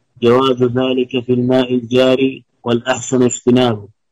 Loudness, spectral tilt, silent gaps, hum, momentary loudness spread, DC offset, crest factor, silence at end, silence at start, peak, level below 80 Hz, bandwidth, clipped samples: -15 LUFS; -5.5 dB/octave; none; none; 6 LU; under 0.1%; 12 dB; 0.25 s; 0.2 s; -2 dBFS; -52 dBFS; 8.8 kHz; under 0.1%